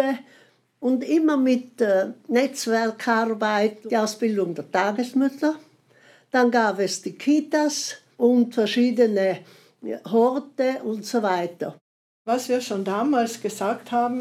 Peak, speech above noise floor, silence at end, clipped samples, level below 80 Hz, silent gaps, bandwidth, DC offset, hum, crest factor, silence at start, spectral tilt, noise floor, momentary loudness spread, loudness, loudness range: -6 dBFS; 33 dB; 0 s; under 0.1%; -88 dBFS; 11.81-12.25 s; 15 kHz; under 0.1%; none; 16 dB; 0 s; -4.5 dB/octave; -55 dBFS; 8 LU; -23 LUFS; 3 LU